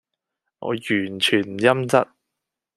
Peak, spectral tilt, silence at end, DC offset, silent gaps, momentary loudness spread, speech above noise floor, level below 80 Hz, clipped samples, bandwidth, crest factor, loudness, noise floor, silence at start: -2 dBFS; -4.5 dB/octave; 0.7 s; under 0.1%; none; 11 LU; 63 dB; -68 dBFS; under 0.1%; 13.5 kHz; 22 dB; -21 LUFS; -83 dBFS; 0.6 s